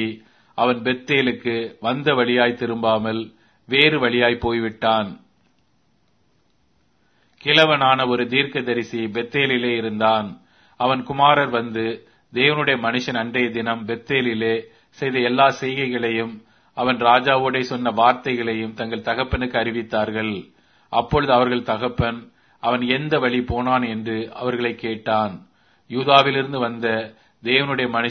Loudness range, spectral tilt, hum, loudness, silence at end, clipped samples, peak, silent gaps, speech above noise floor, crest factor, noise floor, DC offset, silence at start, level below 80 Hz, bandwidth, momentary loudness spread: 3 LU; -6 dB/octave; none; -20 LUFS; 0 s; under 0.1%; 0 dBFS; none; 44 dB; 20 dB; -64 dBFS; under 0.1%; 0 s; -48 dBFS; 6.6 kHz; 11 LU